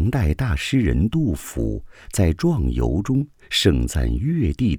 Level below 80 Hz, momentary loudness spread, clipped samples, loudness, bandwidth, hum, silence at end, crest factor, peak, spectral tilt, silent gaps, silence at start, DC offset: -28 dBFS; 7 LU; under 0.1%; -21 LUFS; 18.5 kHz; none; 0 s; 18 dB; -2 dBFS; -6 dB/octave; none; 0 s; under 0.1%